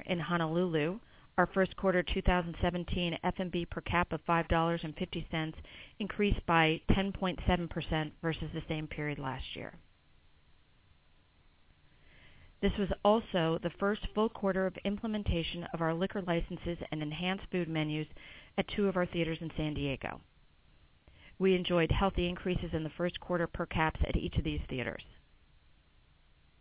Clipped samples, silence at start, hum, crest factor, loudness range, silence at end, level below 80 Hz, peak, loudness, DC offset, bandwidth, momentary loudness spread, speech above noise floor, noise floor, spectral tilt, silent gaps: under 0.1%; 0 s; none; 22 dB; 6 LU; 1.5 s; -44 dBFS; -12 dBFS; -33 LUFS; under 0.1%; 4 kHz; 10 LU; 32 dB; -65 dBFS; -4.5 dB/octave; none